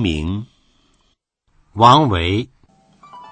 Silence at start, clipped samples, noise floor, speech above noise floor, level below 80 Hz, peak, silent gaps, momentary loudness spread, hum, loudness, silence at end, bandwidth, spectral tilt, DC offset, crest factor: 0 s; under 0.1%; -65 dBFS; 50 dB; -38 dBFS; 0 dBFS; none; 21 LU; none; -15 LUFS; 0.1 s; 9 kHz; -6 dB/octave; under 0.1%; 18 dB